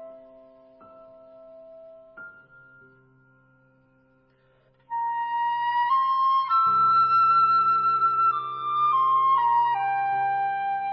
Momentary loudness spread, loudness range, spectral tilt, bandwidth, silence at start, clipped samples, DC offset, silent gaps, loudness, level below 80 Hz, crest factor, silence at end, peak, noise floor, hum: 9 LU; 13 LU; -6.5 dB/octave; 5.8 kHz; 0 s; under 0.1%; under 0.1%; none; -22 LUFS; -74 dBFS; 12 dB; 0 s; -14 dBFS; -63 dBFS; none